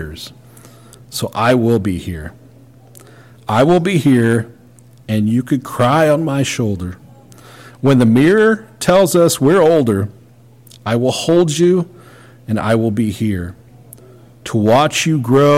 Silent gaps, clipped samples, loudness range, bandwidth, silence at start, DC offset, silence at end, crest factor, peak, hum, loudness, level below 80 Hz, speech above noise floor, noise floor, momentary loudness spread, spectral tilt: none; under 0.1%; 5 LU; 16.5 kHz; 0 s; under 0.1%; 0 s; 12 dB; -4 dBFS; none; -14 LUFS; -46 dBFS; 31 dB; -44 dBFS; 17 LU; -6 dB/octave